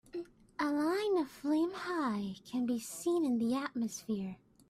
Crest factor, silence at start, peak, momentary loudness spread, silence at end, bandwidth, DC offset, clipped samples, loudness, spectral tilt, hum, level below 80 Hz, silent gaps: 14 dB; 0.15 s; -22 dBFS; 7 LU; 0.35 s; 15.5 kHz; under 0.1%; under 0.1%; -35 LUFS; -5 dB/octave; none; -72 dBFS; none